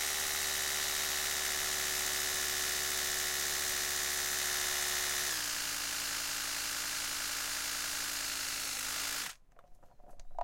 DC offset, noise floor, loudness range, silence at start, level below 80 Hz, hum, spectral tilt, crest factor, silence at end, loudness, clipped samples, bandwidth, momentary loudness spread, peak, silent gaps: under 0.1%; -56 dBFS; 3 LU; 0 s; -58 dBFS; none; 1 dB/octave; 16 dB; 0 s; -33 LUFS; under 0.1%; 17 kHz; 3 LU; -20 dBFS; none